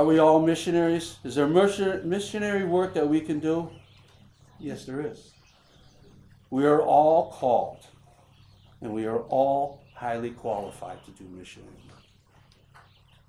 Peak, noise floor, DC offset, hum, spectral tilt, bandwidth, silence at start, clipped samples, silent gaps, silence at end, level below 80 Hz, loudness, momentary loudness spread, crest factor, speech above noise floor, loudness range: -6 dBFS; -58 dBFS; under 0.1%; none; -6 dB/octave; 13 kHz; 0 s; under 0.1%; none; 1.6 s; -62 dBFS; -25 LUFS; 21 LU; 20 dB; 33 dB; 10 LU